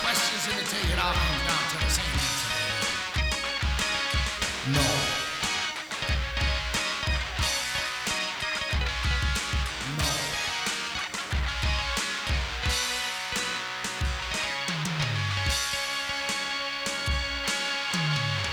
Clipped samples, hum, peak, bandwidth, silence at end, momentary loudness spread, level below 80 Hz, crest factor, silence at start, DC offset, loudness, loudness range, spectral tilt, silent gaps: under 0.1%; none; -10 dBFS; over 20 kHz; 0 s; 4 LU; -36 dBFS; 18 dB; 0 s; under 0.1%; -27 LUFS; 2 LU; -2.5 dB/octave; none